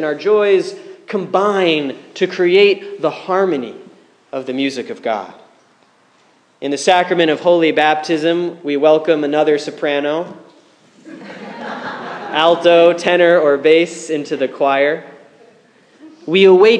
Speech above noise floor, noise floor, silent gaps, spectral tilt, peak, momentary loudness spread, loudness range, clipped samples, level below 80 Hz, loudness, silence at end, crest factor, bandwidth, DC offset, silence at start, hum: 39 dB; -53 dBFS; none; -4.5 dB/octave; 0 dBFS; 16 LU; 7 LU; under 0.1%; -68 dBFS; -15 LUFS; 0 s; 14 dB; 10 kHz; under 0.1%; 0 s; none